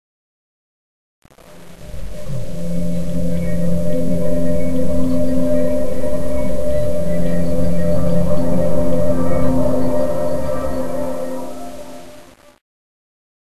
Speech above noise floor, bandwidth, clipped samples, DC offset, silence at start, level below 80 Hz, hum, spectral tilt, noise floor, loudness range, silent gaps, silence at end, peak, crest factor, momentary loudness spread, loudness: 27 dB; 13.5 kHz; under 0.1%; 20%; 1.2 s; -32 dBFS; none; -8 dB/octave; -42 dBFS; 7 LU; none; 0.8 s; -2 dBFS; 14 dB; 17 LU; -21 LUFS